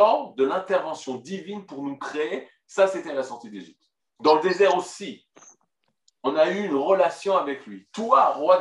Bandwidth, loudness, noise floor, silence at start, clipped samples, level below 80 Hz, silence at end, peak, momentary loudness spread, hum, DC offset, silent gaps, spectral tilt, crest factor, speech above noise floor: 11 kHz; -23 LUFS; -74 dBFS; 0 s; under 0.1%; -82 dBFS; 0 s; -4 dBFS; 16 LU; none; under 0.1%; none; -4.5 dB/octave; 20 dB; 51 dB